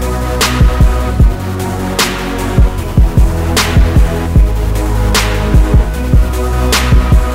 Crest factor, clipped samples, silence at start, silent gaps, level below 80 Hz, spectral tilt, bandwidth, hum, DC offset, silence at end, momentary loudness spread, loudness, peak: 10 dB; under 0.1%; 0 s; none; -12 dBFS; -5 dB/octave; 16.5 kHz; none; under 0.1%; 0 s; 5 LU; -12 LUFS; 0 dBFS